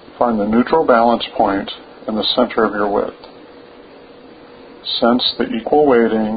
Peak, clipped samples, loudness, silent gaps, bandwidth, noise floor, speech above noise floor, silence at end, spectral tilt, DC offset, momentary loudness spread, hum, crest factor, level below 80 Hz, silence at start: 0 dBFS; under 0.1%; -16 LUFS; none; 5 kHz; -40 dBFS; 25 dB; 0 s; -10.5 dB/octave; under 0.1%; 11 LU; none; 16 dB; -48 dBFS; 0.15 s